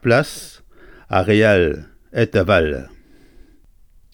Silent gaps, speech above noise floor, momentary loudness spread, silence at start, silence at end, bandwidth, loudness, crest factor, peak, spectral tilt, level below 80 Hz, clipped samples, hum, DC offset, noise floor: none; 33 dB; 17 LU; 0.05 s; 1.25 s; 18.5 kHz; -17 LUFS; 18 dB; -2 dBFS; -6 dB/octave; -40 dBFS; under 0.1%; none; under 0.1%; -49 dBFS